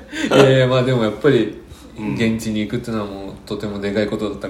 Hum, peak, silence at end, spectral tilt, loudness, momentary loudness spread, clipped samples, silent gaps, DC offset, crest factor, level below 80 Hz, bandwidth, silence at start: none; 0 dBFS; 0 s; -6 dB/octave; -18 LUFS; 16 LU; under 0.1%; none; under 0.1%; 18 dB; -44 dBFS; 15.5 kHz; 0 s